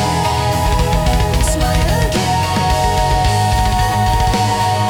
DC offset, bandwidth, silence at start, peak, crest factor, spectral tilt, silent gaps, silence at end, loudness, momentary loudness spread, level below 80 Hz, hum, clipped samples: under 0.1%; 18 kHz; 0 s; -4 dBFS; 10 dB; -4.5 dB/octave; none; 0 s; -15 LUFS; 1 LU; -20 dBFS; none; under 0.1%